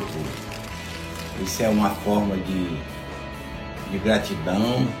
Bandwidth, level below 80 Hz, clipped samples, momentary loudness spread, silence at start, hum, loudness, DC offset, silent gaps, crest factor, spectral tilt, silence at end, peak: 16.5 kHz; -42 dBFS; under 0.1%; 12 LU; 0 s; none; -26 LUFS; under 0.1%; none; 18 dB; -5.5 dB/octave; 0 s; -8 dBFS